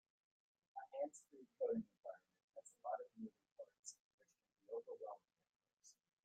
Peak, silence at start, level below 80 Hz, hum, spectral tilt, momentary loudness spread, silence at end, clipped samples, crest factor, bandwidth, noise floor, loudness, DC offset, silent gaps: -32 dBFS; 0.75 s; under -90 dBFS; none; -5 dB/octave; 20 LU; 0.3 s; under 0.1%; 20 dB; 9.8 kHz; -74 dBFS; -51 LUFS; under 0.1%; 1.99-2.03 s, 2.44-2.48 s, 3.52-3.56 s, 3.79-3.83 s, 4.00-4.18 s, 5.56-5.60 s